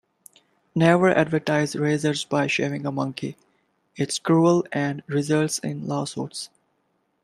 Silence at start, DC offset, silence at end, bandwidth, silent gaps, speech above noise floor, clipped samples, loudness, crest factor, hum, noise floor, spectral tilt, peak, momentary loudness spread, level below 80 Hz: 0.75 s; under 0.1%; 0.75 s; 13.5 kHz; none; 48 dB; under 0.1%; -23 LUFS; 20 dB; none; -71 dBFS; -5.5 dB/octave; -4 dBFS; 13 LU; -64 dBFS